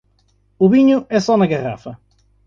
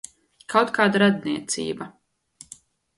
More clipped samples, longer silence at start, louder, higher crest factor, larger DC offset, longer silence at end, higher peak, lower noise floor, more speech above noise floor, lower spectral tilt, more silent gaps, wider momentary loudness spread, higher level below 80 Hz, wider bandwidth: neither; about the same, 0.6 s vs 0.5 s; first, -15 LUFS vs -22 LUFS; second, 16 dB vs 22 dB; neither; second, 0.5 s vs 1.1 s; about the same, -2 dBFS vs -4 dBFS; first, -59 dBFS vs -52 dBFS; first, 44 dB vs 30 dB; first, -7 dB/octave vs -4.5 dB/octave; neither; second, 17 LU vs 25 LU; first, -54 dBFS vs -66 dBFS; second, 7.4 kHz vs 11.5 kHz